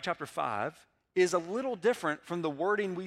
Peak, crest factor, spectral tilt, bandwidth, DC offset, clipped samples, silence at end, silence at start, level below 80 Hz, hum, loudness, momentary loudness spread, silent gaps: -14 dBFS; 18 dB; -5 dB/octave; 14 kHz; under 0.1%; under 0.1%; 0 s; 0 s; -76 dBFS; none; -32 LUFS; 7 LU; none